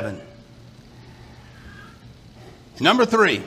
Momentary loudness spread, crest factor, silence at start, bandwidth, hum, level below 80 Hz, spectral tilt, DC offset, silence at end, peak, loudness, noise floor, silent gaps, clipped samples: 27 LU; 24 dB; 0 s; 15.5 kHz; none; -54 dBFS; -4.5 dB/octave; under 0.1%; 0 s; 0 dBFS; -18 LUFS; -46 dBFS; none; under 0.1%